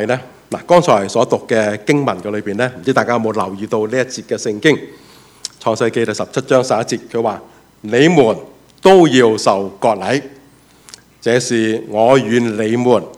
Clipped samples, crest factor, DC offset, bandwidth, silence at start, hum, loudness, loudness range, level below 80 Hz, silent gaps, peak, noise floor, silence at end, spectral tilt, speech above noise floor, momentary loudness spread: 0.1%; 14 dB; under 0.1%; 14.5 kHz; 0 s; none; -15 LUFS; 5 LU; -56 dBFS; none; 0 dBFS; -46 dBFS; 0 s; -5 dB/octave; 32 dB; 11 LU